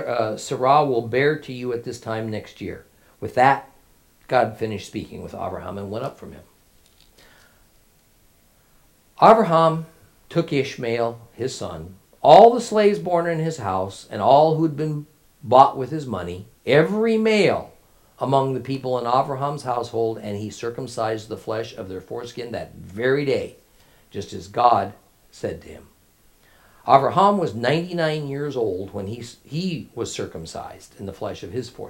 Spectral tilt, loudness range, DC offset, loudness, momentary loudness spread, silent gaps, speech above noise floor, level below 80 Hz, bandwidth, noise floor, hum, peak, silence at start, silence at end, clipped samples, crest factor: -6 dB/octave; 10 LU; under 0.1%; -21 LUFS; 18 LU; none; 36 dB; -58 dBFS; 16.5 kHz; -57 dBFS; none; 0 dBFS; 0 s; 0 s; under 0.1%; 22 dB